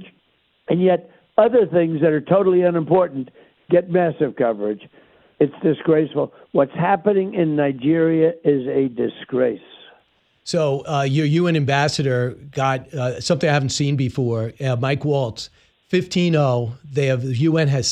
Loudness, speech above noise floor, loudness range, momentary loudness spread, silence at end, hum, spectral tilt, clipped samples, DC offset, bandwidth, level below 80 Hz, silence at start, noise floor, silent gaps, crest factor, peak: -19 LUFS; 44 dB; 3 LU; 8 LU; 0 s; none; -6.5 dB/octave; under 0.1%; under 0.1%; 10.5 kHz; -58 dBFS; 0 s; -63 dBFS; none; 18 dB; -2 dBFS